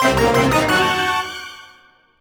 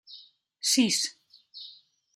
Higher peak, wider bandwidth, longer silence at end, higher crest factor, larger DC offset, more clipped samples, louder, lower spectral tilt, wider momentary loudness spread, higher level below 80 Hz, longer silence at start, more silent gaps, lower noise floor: first, -2 dBFS vs -12 dBFS; first, over 20 kHz vs 15 kHz; about the same, 0.55 s vs 0.45 s; about the same, 16 dB vs 20 dB; neither; neither; first, -16 LUFS vs -25 LUFS; first, -4 dB/octave vs -1.5 dB/octave; second, 15 LU vs 25 LU; first, -38 dBFS vs -80 dBFS; about the same, 0 s vs 0.1 s; neither; about the same, -51 dBFS vs -54 dBFS